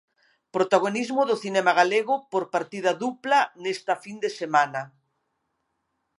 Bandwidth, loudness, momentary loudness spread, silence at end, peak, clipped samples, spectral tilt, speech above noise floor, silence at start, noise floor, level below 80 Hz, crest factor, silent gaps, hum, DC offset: 11.5 kHz; -24 LUFS; 9 LU; 1.3 s; -4 dBFS; under 0.1%; -4 dB/octave; 53 dB; 0.55 s; -77 dBFS; -82 dBFS; 22 dB; none; none; under 0.1%